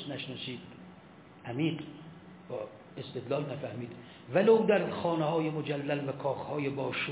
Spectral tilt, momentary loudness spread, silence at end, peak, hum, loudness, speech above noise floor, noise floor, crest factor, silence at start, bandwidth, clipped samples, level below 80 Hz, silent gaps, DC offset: -5 dB/octave; 22 LU; 0 s; -14 dBFS; none; -32 LUFS; 22 dB; -54 dBFS; 20 dB; 0 s; 4 kHz; under 0.1%; -70 dBFS; none; under 0.1%